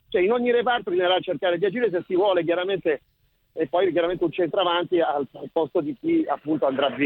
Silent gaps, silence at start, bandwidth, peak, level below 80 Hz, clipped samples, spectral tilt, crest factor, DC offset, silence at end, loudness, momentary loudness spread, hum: none; 0.1 s; 4.2 kHz; -8 dBFS; -62 dBFS; under 0.1%; -8.5 dB/octave; 14 dB; under 0.1%; 0 s; -23 LUFS; 6 LU; none